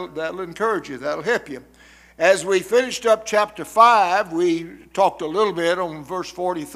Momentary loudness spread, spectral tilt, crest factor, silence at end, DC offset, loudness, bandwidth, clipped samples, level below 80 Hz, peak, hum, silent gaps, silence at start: 13 LU; -3.5 dB/octave; 20 dB; 0 s; under 0.1%; -20 LUFS; 16 kHz; under 0.1%; -58 dBFS; 0 dBFS; none; none; 0 s